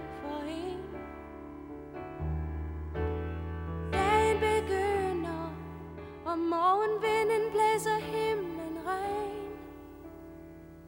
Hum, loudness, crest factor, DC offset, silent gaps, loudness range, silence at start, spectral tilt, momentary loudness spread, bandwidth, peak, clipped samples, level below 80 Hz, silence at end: 50 Hz at -65 dBFS; -31 LUFS; 18 dB; under 0.1%; none; 9 LU; 0 s; -5.5 dB/octave; 18 LU; 16.5 kHz; -14 dBFS; under 0.1%; -46 dBFS; 0 s